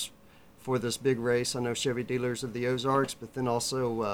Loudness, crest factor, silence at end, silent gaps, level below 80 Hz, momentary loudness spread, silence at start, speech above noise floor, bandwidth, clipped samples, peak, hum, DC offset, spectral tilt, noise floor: -30 LUFS; 18 dB; 0 s; none; -62 dBFS; 6 LU; 0 s; 26 dB; 19.5 kHz; under 0.1%; -14 dBFS; none; under 0.1%; -4.5 dB/octave; -55 dBFS